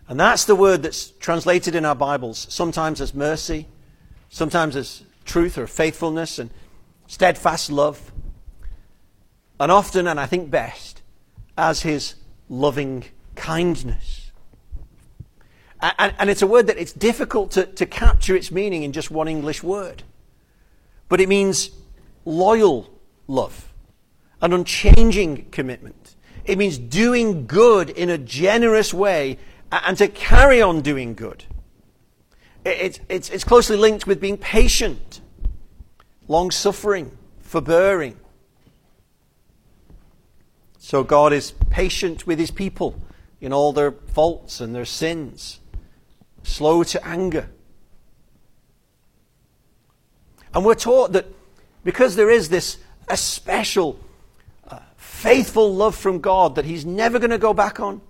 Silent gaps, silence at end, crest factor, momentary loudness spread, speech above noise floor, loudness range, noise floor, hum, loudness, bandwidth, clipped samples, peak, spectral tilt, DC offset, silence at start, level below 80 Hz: none; 0.1 s; 20 dB; 17 LU; 42 dB; 7 LU; -60 dBFS; none; -19 LUFS; 16.5 kHz; under 0.1%; 0 dBFS; -4.5 dB/octave; under 0.1%; 0.1 s; -28 dBFS